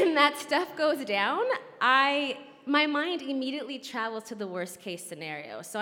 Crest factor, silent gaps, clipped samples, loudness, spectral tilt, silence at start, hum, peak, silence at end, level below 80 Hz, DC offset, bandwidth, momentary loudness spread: 22 dB; none; under 0.1%; -28 LUFS; -3 dB/octave; 0 s; none; -6 dBFS; 0 s; -84 dBFS; under 0.1%; 17.5 kHz; 14 LU